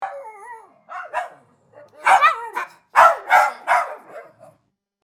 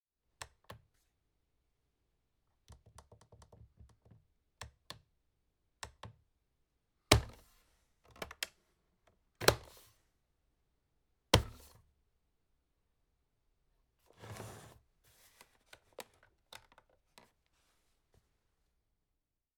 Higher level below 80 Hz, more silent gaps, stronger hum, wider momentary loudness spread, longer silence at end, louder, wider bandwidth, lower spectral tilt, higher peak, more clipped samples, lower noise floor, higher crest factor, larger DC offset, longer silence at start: second, -66 dBFS vs -54 dBFS; neither; neither; second, 23 LU vs 27 LU; second, 0.8 s vs 3.55 s; first, -17 LUFS vs -34 LUFS; about the same, 19 kHz vs over 20 kHz; second, -0.5 dB/octave vs -3.5 dB/octave; first, 0 dBFS vs -4 dBFS; neither; second, -65 dBFS vs -87 dBFS; second, 20 dB vs 40 dB; neither; second, 0 s vs 0.7 s